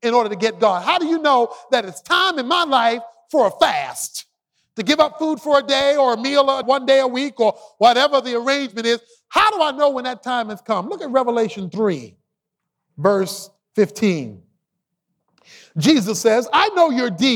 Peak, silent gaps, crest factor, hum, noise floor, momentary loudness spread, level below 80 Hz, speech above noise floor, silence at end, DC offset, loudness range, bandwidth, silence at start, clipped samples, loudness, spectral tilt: -2 dBFS; none; 16 dB; none; -80 dBFS; 9 LU; -64 dBFS; 62 dB; 0 s; under 0.1%; 6 LU; 17 kHz; 0.05 s; under 0.1%; -18 LUFS; -4 dB/octave